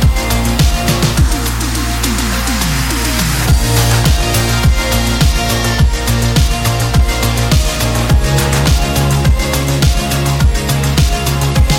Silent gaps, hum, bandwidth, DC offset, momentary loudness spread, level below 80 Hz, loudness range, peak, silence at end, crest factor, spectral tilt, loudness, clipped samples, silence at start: none; none; 17 kHz; 0.2%; 3 LU; -16 dBFS; 1 LU; 0 dBFS; 0 s; 12 dB; -4.5 dB/octave; -13 LUFS; under 0.1%; 0 s